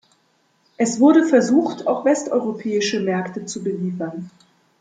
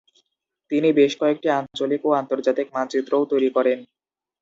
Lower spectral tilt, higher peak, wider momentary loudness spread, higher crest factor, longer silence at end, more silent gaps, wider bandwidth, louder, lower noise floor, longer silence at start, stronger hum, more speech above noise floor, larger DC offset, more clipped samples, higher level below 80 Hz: about the same, -5 dB/octave vs -5.5 dB/octave; about the same, -4 dBFS vs -6 dBFS; first, 14 LU vs 7 LU; about the same, 16 dB vs 16 dB; about the same, 0.5 s vs 0.55 s; neither; first, 9.4 kHz vs 7.8 kHz; about the same, -19 LUFS vs -21 LUFS; second, -63 dBFS vs -75 dBFS; about the same, 0.8 s vs 0.7 s; neither; second, 44 dB vs 55 dB; neither; neither; about the same, -68 dBFS vs -72 dBFS